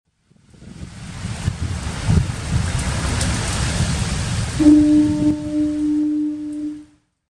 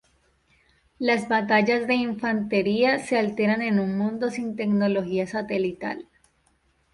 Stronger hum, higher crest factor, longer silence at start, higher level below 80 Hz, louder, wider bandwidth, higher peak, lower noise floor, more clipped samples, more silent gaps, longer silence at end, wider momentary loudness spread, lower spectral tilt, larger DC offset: neither; about the same, 18 dB vs 18 dB; second, 0.6 s vs 1 s; first, -30 dBFS vs -62 dBFS; first, -19 LUFS vs -24 LUFS; about the same, 12 kHz vs 11 kHz; first, -2 dBFS vs -6 dBFS; second, -54 dBFS vs -66 dBFS; neither; neither; second, 0.45 s vs 0.9 s; first, 17 LU vs 7 LU; about the same, -5.5 dB/octave vs -6 dB/octave; neither